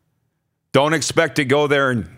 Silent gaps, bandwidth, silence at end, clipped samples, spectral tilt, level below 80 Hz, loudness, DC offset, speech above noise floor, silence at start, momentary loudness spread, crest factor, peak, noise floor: none; 16 kHz; 0.1 s; under 0.1%; -4.5 dB/octave; -56 dBFS; -17 LUFS; under 0.1%; 54 dB; 0.75 s; 2 LU; 18 dB; 0 dBFS; -71 dBFS